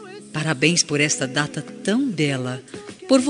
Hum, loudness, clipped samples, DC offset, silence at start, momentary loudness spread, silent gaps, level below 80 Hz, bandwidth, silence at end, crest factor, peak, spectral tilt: none; -21 LUFS; under 0.1%; under 0.1%; 0 s; 14 LU; none; -64 dBFS; 11.5 kHz; 0 s; 20 dB; -2 dBFS; -3.5 dB/octave